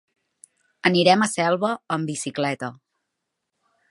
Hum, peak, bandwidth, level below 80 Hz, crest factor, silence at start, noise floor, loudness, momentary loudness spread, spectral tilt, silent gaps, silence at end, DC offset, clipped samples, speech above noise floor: none; -2 dBFS; 11.5 kHz; -72 dBFS; 22 dB; 0.85 s; -80 dBFS; -22 LUFS; 11 LU; -4.5 dB/octave; none; 1.15 s; under 0.1%; under 0.1%; 59 dB